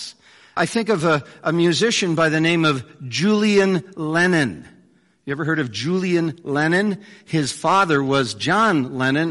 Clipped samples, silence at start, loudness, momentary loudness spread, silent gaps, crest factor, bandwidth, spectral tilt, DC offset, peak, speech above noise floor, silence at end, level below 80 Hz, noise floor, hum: under 0.1%; 0 s; -19 LUFS; 9 LU; none; 14 dB; 11.5 kHz; -5 dB/octave; under 0.1%; -6 dBFS; 37 dB; 0 s; -60 dBFS; -56 dBFS; none